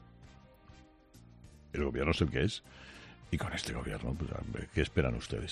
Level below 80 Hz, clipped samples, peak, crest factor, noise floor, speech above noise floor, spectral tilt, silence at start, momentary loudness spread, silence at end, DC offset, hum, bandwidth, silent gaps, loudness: -46 dBFS; under 0.1%; -14 dBFS; 22 dB; -58 dBFS; 24 dB; -6 dB/octave; 0 s; 14 LU; 0 s; under 0.1%; none; 13.5 kHz; none; -35 LUFS